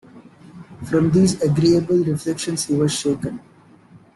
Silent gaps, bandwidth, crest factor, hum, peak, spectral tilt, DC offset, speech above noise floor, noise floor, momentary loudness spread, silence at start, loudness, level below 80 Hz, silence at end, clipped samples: none; 12.5 kHz; 14 dB; none; -6 dBFS; -6 dB/octave; under 0.1%; 30 dB; -48 dBFS; 11 LU; 0.15 s; -19 LUFS; -50 dBFS; 0.2 s; under 0.1%